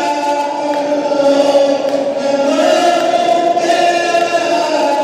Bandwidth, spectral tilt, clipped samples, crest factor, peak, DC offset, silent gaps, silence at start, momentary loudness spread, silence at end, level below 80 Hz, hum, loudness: 14.5 kHz; -3 dB/octave; under 0.1%; 12 dB; 0 dBFS; under 0.1%; none; 0 s; 5 LU; 0 s; -68 dBFS; none; -13 LUFS